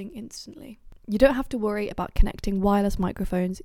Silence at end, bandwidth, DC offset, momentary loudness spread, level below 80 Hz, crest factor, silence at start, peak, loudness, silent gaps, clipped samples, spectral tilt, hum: 0.05 s; 16.5 kHz; under 0.1%; 19 LU; -30 dBFS; 20 dB; 0 s; -4 dBFS; -25 LUFS; none; under 0.1%; -7 dB/octave; none